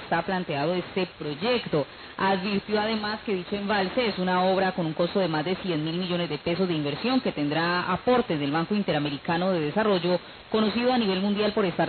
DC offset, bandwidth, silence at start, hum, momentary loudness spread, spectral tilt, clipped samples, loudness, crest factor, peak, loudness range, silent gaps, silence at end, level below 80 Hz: under 0.1%; 4.6 kHz; 0 s; none; 5 LU; -10.5 dB/octave; under 0.1%; -26 LUFS; 14 dB; -12 dBFS; 2 LU; none; 0 s; -56 dBFS